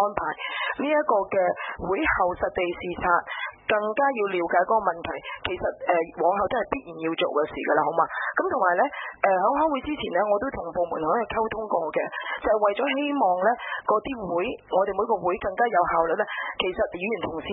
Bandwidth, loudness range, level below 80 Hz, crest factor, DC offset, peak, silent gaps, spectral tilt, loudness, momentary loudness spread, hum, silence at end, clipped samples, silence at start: 4 kHz; 1 LU; -52 dBFS; 20 dB; under 0.1%; -6 dBFS; none; -9 dB/octave; -25 LUFS; 7 LU; none; 0 s; under 0.1%; 0 s